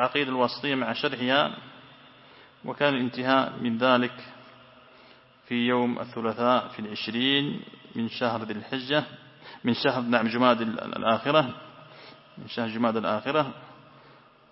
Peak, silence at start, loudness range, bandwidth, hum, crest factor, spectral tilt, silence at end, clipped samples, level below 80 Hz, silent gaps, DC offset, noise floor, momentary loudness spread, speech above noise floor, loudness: -6 dBFS; 0 s; 2 LU; 5.8 kHz; none; 22 dB; -9 dB/octave; 0.75 s; under 0.1%; -72 dBFS; none; under 0.1%; -55 dBFS; 20 LU; 28 dB; -26 LUFS